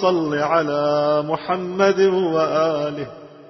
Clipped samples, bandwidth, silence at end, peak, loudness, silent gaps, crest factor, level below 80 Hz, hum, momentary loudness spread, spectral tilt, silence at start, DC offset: under 0.1%; 6.2 kHz; 0 s; -4 dBFS; -19 LUFS; none; 14 dB; -60 dBFS; none; 7 LU; -6 dB/octave; 0 s; under 0.1%